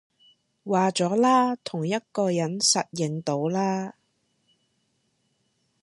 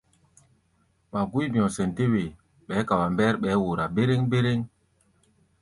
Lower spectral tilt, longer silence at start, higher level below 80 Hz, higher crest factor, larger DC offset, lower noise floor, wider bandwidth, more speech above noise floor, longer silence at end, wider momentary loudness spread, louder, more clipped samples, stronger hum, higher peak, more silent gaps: second, -4 dB/octave vs -7 dB/octave; second, 0.65 s vs 1.15 s; second, -74 dBFS vs -54 dBFS; about the same, 20 dB vs 18 dB; neither; first, -72 dBFS vs -67 dBFS; about the same, 11.5 kHz vs 11.5 kHz; first, 48 dB vs 43 dB; first, 1.9 s vs 0.95 s; about the same, 9 LU vs 8 LU; about the same, -24 LUFS vs -25 LUFS; neither; neither; about the same, -8 dBFS vs -8 dBFS; neither